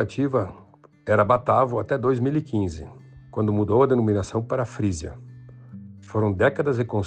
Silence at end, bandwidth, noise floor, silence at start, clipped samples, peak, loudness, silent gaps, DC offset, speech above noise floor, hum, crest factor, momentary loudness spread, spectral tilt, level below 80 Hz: 0 s; 9.2 kHz; -42 dBFS; 0 s; under 0.1%; -4 dBFS; -23 LUFS; none; under 0.1%; 20 dB; none; 18 dB; 20 LU; -7.5 dB/octave; -50 dBFS